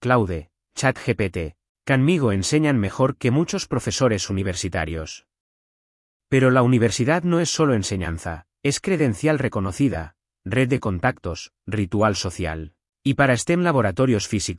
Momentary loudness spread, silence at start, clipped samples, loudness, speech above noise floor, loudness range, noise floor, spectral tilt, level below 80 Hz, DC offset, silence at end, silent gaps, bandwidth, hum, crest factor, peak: 13 LU; 0 s; under 0.1%; -21 LUFS; over 69 dB; 3 LU; under -90 dBFS; -5.5 dB/octave; -48 dBFS; under 0.1%; 0 s; 1.69-1.75 s, 5.40-6.20 s; 12 kHz; none; 18 dB; -4 dBFS